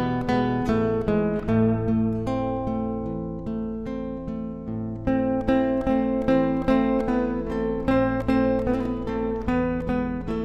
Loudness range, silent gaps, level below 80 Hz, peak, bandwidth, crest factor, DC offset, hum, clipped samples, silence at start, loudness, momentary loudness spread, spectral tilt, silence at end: 5 LU; none; -38 dBFS; -8 dBFS; 7.4 kHz; 16 dB; under 0.1%; none; under 0.1%; 0 s; -25 LUFS; 9 LU; -9 dB/octave; 0 s